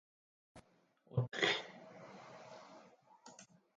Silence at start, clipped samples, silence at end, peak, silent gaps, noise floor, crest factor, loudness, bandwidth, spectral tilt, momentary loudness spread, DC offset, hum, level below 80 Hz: 0.55 s; under 0.1%; 0.35 s; -18 dBFS; none; -73 dBFS; 26 dB; -37 LUFS; 9.4 kHz; -4.5 dB/octave; 25 LU; under 0.1%; none; -74 dBFS